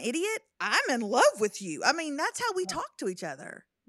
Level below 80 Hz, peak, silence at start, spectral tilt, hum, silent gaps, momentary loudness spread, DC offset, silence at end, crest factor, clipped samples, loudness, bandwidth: -74 dBFS; -8 dBFS; 0 s; -2.5 dB/octave; none; none; 13 LU; under 0.1%; 0.3 s; 22 dB; under 0.1%; -28 LUFS; 15.5 kHz